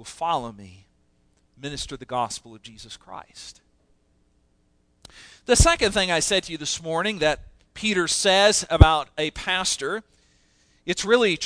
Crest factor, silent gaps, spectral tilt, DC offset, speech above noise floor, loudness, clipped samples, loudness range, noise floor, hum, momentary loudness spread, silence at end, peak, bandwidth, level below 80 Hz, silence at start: 24 dB; none; -3.5 dB/octave; under 0.1%; 42 dB; -22 LUFS; under 0.1%; 14 LU; -65 dBFS; none; 22 LU; 0 s; 0 dBFS; 11 kHz; -32 dBFS; 0 s